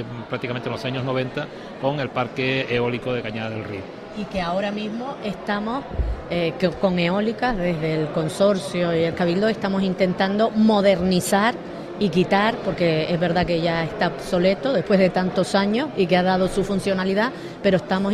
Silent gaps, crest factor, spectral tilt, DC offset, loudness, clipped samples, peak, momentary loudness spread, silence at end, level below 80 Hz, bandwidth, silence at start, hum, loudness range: none; 16 dB; -6 dB/octave; under 0.1%; -22 LUFS; under 0.1%; -6 dBFS; 10 LU; 0 s; -42 dBFS; 13.5 kHz; 0 s; none; 6 LU